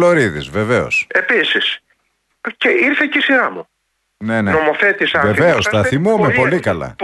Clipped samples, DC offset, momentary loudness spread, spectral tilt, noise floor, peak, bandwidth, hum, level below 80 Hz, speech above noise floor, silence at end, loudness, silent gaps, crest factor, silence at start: under 0.1%; under 0.1%; 8 LU; -5 dB/octave; -66 dBFS; -2 dBFS; 12 kHz; none; -46 dBFS; 51 dB; 0 s; -14 LUFS; none; 14 dB; 0 s